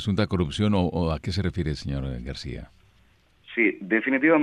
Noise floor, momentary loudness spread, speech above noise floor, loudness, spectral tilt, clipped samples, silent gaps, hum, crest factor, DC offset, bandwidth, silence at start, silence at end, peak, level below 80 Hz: -60 dBFS; 12 LU; 35 dB; -25 LUFS; -7 dB/octave; under 0.1%; none; none; 18 dB; under 0.1%; 11 kHz; 0 s; 0 s; -8 dBFS; -40 dBFS